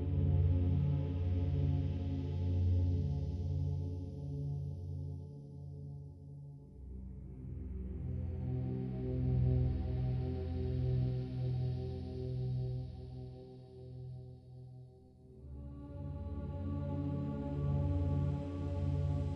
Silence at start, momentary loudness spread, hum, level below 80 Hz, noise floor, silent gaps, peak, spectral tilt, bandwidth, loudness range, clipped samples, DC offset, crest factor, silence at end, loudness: 0 s; 18 LU; none; -46 dBFS; -58 dBFS; none; -22 dBFS; -10.5 dB/octave; 5.4 kHz; 11 LU; under 0.1%; under 0.1%; 14 dB; 0 s; -37 LUFS